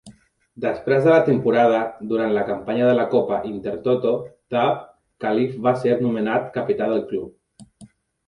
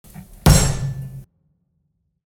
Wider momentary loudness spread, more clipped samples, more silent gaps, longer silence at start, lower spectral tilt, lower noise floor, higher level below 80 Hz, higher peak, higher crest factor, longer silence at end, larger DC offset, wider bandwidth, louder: second, 11 LU vs 21 LU; neither; neither; about the same, 0.05 s vs 0.15 s; first, -8 dB/octave vs -4.5 dB/octave; second, -49 dBFS vs -69 dBFS; second, -58 dBFS vs -28 dBFS; second, -4 dBFS vs 0 dBFS; about the same, 18 dB vs 20 dB; second, 0.4 s vs 1.05 s; neither; second, 10.5 kHz vs 18.5 kHz; second, -21 LUFS vs -18 LUFS